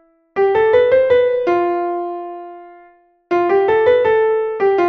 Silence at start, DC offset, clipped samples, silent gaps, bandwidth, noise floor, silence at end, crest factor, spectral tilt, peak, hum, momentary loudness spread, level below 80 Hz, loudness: 0.35 s; under 0.1%; under 0.1%; none; 6.2 kHz; -49 dBFS; 0 s; 14 dB; -7 dB/octave; -2 dBFS; none; 14 LU; -54 dBFS; -15 LUFS